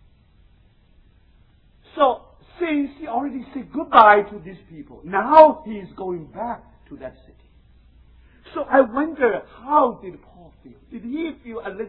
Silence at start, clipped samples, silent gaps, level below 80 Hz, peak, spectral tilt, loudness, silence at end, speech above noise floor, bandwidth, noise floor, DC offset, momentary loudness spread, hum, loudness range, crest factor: 1.95 s; under 0.1%; none; -54 dBFS; 0 dBFS; -8.5 dB/octave; -19 LUFS; 0 s; 35 dB; 5.2 kHz; -55 dBFS; under 0.1%; 26 LU; none; 9 LU; 22 dB